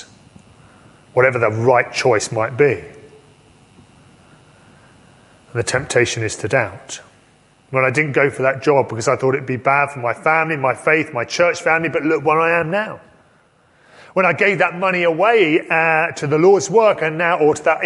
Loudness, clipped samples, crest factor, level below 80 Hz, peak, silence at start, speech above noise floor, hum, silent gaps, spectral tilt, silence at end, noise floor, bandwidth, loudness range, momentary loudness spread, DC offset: -16 LUFS; under 0.1%; 18 dB; -54 dBFS; 0 dBFS; 0 s; 38 dB; none; none; -5 dB/octave; 0 s; -54 dBFS; 11.5 kHz; 8 LU; 8 LU; under 0.1%